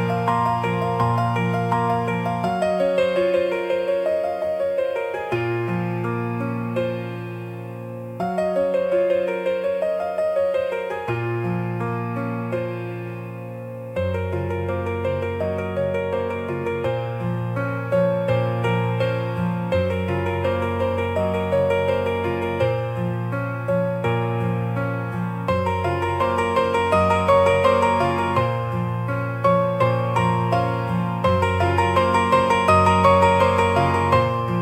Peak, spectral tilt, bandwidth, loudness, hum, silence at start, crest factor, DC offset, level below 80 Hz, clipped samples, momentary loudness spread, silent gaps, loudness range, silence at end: -2 dBFS; -7 dB/octave; 15.5 kHz; -22 LUFS; none; 0 s; 18 dB; under 0.1%; -54 dBFS; under 0.1%; 8 LU; none; 7 LU; 0 s